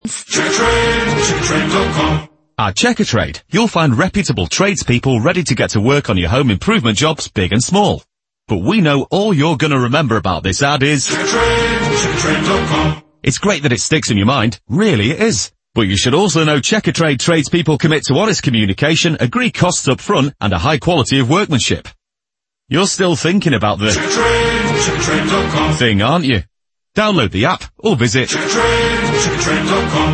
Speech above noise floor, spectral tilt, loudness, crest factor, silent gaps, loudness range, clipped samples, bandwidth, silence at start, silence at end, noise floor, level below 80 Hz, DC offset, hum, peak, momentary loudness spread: 71 dB; -4.5 dB/octave; -14 LUFS; 14 dB; none; 1 LU; under 0.1%; 8.8 kHz; 0.05 s; 0 s; -85 dBFS; -34 dBFS; under 0.1%; none; 0 dBFS; 4 LU